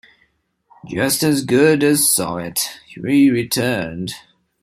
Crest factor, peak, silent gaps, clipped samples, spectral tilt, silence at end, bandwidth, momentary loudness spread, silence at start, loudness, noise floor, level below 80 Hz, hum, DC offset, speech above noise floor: 16 dB; -2 dBFS; none; under 0.1%; -4 dB/octave; 0.45 s; 16 kHz; 15 LU; 0.85 s; -16 LUFS; -63 dBFS; -54 dBFS; none; under 0.1%; 46 dB